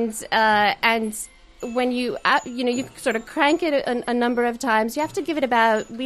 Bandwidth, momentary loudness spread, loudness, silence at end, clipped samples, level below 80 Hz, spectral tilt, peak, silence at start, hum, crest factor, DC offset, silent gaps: 13 kHz; 7 LU; -21 LUFS; 0 s; under 0.1%; -54 dBFS; -3 dB/octave; -4 dBFS; 0 s; none; 18 dB; under 0.1%; none